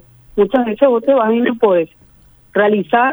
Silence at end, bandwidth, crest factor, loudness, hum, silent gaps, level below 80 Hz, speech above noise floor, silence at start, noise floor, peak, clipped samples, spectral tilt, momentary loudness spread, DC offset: 0 s; over 20 kHz; 14 dB; -14 LUFS; none; none; -50 dBFS; 34 dB; 0.35 s; -47 dBFS; 0 dBFS; under 0.1%; -8 dB/octave; 7 LU; under 0.1%